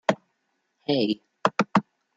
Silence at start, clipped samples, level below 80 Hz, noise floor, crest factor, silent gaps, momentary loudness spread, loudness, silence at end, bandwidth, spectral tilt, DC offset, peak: 0.1 s; under 0.1%; -70 dBFS; -75 dBFS; 26 dB; none; 8 LU; -26 LUFS; 0.35 s; 8 kHz; -5.5 dB/octave; under 0.1%; -2 dBFS